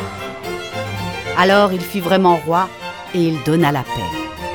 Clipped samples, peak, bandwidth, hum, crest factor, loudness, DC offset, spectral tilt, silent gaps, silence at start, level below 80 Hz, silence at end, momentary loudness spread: under 0.1%; 0 dBFS; 19 kHz; none; 18 dB; -18 LUFS; 0.2%; -6 dB/octave; none; 0 s; -46 dBFS; 0 s; 13 LU